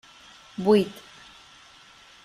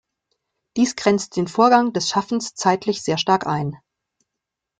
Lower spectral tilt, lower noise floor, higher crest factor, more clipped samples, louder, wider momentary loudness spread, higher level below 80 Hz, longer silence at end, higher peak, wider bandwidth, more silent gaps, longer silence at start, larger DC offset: first, -6.5 dB/octave vs -4.5 dB/octave; second, -52 dBFS vs -83 dBFS; about the same, 20 dB vs 20 dB; neither; second, -23 LUFS vs -20 LUFS; first, 26 LU vs 10 LU; about the same, -66 dBFS vs -62 dBFS; first, 1.3 s vs 1.05 s; second, -8 dBFS vs -2 dBFS; first, 14 kHz vs 9.4 kHz; neither; second, 0.6 s vs 0.75 s; neither